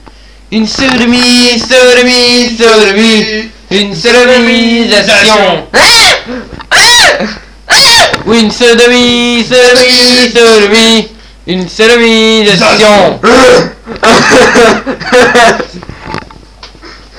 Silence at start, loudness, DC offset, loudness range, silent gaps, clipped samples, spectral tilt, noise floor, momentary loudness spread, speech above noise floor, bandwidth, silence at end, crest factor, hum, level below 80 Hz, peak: 0.5 s; -4 LUFS; 1%; 2 LU; none; 7%; -2.5 dB/octave; -33 dBFS; 12 LU; 29 dB; 11 kHz; 0.25 s; 6 dB; none; -32 dBFS; 0 dBFS